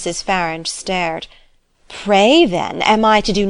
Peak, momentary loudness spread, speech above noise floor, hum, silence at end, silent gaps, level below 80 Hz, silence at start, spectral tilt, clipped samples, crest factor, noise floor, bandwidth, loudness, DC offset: -2 dBFS; 17 LU; 32 dB; none; 0 s; none; -38 dBFS; 0 s; -4 dB/octave; under 0.1%; 14 dB; -48 dBFS; 11 kHz; -15 LUFS; under 0.1%